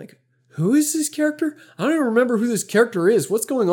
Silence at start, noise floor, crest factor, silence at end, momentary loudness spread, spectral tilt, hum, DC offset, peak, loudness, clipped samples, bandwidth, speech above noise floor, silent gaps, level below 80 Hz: 0 s; -53 dBFS; 16 dB; 0 s; 8 LU; -5 dB/octave; none; under 0.1%; -4 dBFS; -20 LUFS; under 0.1%; 18.5 kHz; 34 dB; none; -80 dBFS